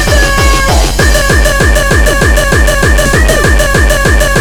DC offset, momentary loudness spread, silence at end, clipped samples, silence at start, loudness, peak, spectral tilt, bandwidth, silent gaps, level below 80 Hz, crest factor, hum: 1%; 1 LU; 0 s; 2%; 0 s; -8 LUFS; 0 dBFS; -4 dB/octave; 20 kHz; none; -10 dBFS; 6 dB; none